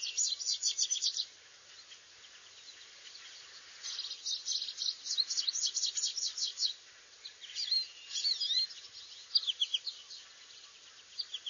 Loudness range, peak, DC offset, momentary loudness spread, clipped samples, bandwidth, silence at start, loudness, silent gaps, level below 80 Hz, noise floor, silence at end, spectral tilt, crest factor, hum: 7 LU; -16 dBFS; under 0.1%; 21 LU; under 0.1%; 7.4 kHz; 0 s; -33 LUFS; none; -88 dBFS; -57 dBFS; 0 s; 5 dB/octave; 22 dB; none